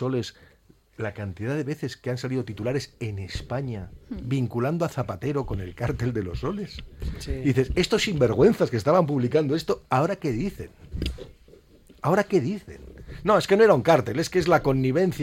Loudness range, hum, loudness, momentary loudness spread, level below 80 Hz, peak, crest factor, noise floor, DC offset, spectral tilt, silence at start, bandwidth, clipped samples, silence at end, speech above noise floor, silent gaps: 8 LU; none; -25 LUFS; 15 LU; -42 dBFS; -4 dBFS; 20 dB; -53 dBFS; under 0.1%; -6.5 dB/octave; 0 s; 16.5 kHz; under 0.1%; 0 s; 29 dB; none